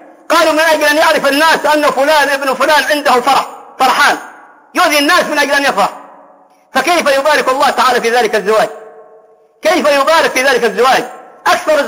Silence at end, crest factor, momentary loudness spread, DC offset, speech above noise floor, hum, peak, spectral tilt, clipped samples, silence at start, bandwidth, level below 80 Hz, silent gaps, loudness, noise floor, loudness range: 0 s; 10 dB; 6 LU; under 0.1%; 34 dB; none; 0 dBFS; -2 dB/octave; under 0.1%; 0.3 s; 16.5 kHz; -54 dBFS; none; -11 LUFS; -44 dBFS; 2 LU